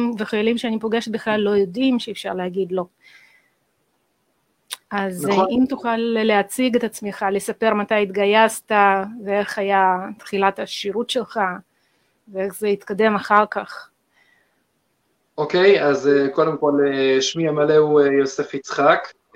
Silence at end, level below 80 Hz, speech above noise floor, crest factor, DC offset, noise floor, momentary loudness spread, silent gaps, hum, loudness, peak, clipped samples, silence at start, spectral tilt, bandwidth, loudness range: 0.25 s; -64 dBFS; 49 dB; 20 dB; under 0.1%; -68 dBFS; 11 LU; none; none; -19 LUFS; 0 dBFS; under 0.1%; 0 s; -4.5 dB/octave; 16 kHz; 7 LU